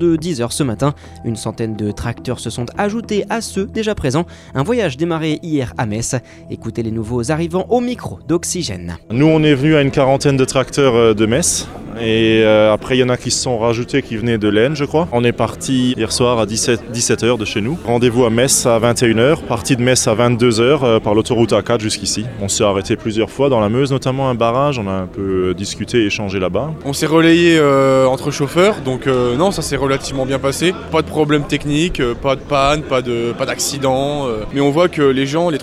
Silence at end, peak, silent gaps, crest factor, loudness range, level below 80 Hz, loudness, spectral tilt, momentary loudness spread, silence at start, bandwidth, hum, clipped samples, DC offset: 0 s; -2 dBFS; none; 14 dB; 6 LU; -38 dBFS; -15 LUFS; -5 dB/octave; 9 LU; 0 s; 15 kHz; none; under 0.1%; under 0.1%